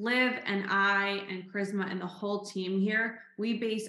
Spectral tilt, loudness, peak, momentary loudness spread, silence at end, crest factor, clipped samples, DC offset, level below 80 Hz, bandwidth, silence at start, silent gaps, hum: -5 dB/octave; -31 LUFS; -14 dBFS; 10 LU; 0 s; 18 dB; under 0.1%; under 0.1%; under -90 dBFS; 12 kHz; 0 s; none; none